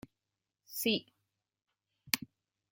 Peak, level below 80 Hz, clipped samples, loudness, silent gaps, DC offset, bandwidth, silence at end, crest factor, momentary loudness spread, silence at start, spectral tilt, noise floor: -4 dBFS; -78 dBFS; under 0.1%; -35 LUFS; none; under 0.1%; 17 kHz; 0.45 s; 36 dB; 11 LU; 0.7 s; -2.5 dB/octave; -89 dBFS